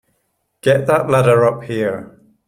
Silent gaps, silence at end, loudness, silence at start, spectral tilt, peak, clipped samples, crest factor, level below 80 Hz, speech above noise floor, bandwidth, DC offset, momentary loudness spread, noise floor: none; 0.45 s; -15 LUFS; 0.65 s; -6.5 dB/octave; 0 dBFS; under 0.1%; 16 dB; -54 dBFS; 53 dB; 16 kHz; under 0.1%; 9 LU; -68 dBFS